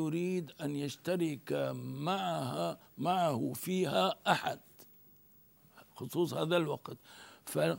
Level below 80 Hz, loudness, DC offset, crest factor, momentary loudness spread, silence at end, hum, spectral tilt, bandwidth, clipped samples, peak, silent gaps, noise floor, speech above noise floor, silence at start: -78 dBFS; -35 LUFS; under 0.1%; 24 dB; 11 LU; 0 s; none; -5.5 dB/octave; 16 kHz; under 0.1%; -12 dBFS; none; -63 dBFS; 29 dB; 0 s